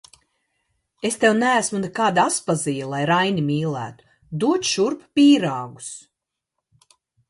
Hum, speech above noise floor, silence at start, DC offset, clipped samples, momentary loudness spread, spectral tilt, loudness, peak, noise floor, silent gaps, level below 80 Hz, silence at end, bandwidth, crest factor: none; 62 dB; 1.05 s; under 0.1%; under 0.1%; 17 LU; -4.5 dB/octave; -20 LUFS; -2 dBFS; -82 dBFS; none; -64 dBFS; 1.3 s; 11.5 kHz; 20 dB